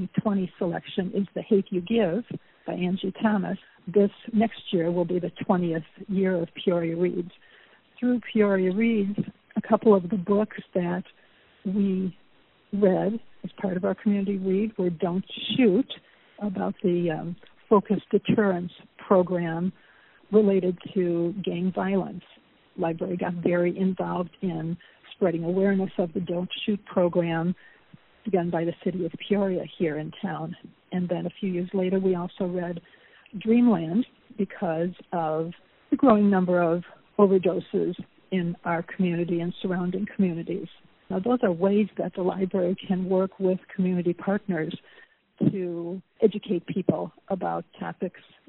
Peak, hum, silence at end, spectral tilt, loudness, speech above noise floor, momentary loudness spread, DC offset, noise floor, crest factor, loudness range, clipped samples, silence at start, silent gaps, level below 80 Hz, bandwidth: -6 dBFS; none; 0.3 s; -6.5 dB/octave; -26 LUFS; 36 dB; 12 LU; under 0.1%; -61 dBFS; 20 dB; 4 LU; under 0.1%; 0 s; none; -64 dBFS; 4.1 kHz